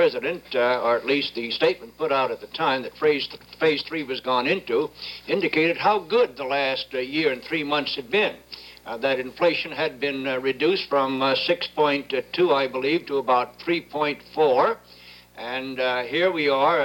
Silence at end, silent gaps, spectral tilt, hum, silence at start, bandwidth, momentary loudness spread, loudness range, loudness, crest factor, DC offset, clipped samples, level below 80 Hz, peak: 0 s; none; -5.5 dB/octave; none; 0 s; 19.5 kHz; 7 LU; 2 LU; -23 LUFS; 16 dB; under 0.1%; under 0.1%; -62 dBFS; -8 dBFS